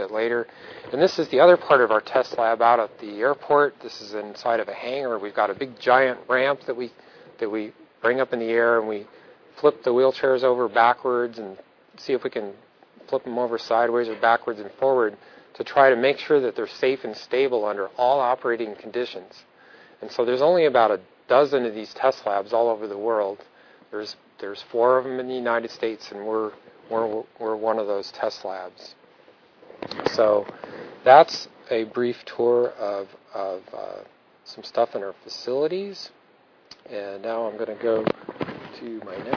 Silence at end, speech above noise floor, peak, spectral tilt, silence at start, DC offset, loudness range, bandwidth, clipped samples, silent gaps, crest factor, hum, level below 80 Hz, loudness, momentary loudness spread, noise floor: 0 s; 34 dB; 0 dBFS; -5.5 dB/octave; 0 s; under 0.1%; 8 LU; 5.4 kHz; under 0.1%; none; 24 dB; none; -72 dBFS; -23 LUFS; 17 LU; -57 dBFS